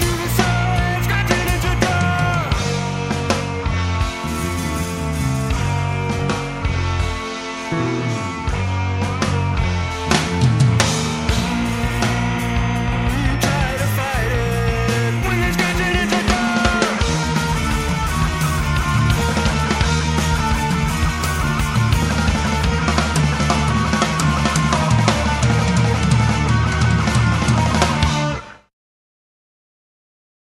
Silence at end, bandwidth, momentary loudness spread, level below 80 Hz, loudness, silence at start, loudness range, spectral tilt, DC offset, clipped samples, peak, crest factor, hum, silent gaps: 1.9 s; 16 kHz; 6 LU; -26 dBFS; -18 LUFS; 0 s; 5 LU; -5 dB/octave; under 0.1%; under 0.1%; 0 dBFS; 18 dB; none; none